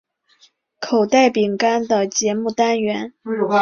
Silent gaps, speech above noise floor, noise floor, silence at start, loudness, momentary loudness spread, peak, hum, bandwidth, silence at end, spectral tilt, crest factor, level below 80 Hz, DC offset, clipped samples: none; 39 dB; -56 dBFS; 0.8 s; -18 LUFS; 10 LU; -2 dBFS; none; 7.4 kHz; 0 s; -3.5 dB/octave; 16 dB; -64 dBFS; under 0.1%; under 0.1%